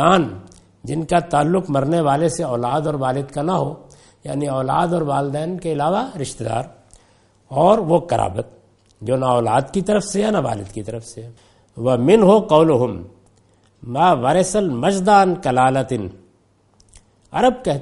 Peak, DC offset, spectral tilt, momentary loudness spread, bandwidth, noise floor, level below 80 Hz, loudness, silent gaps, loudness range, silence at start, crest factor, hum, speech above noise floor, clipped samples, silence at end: 0 dBFS; under 0.1%; -6 dB/octave; 16 LU; 11.5 kHz; -58 dBFS; -46 dBFS; -18 LUFS; none; 5 LU; 0 s; 18 dB; none; 40 dB; under 0.1%; 0 s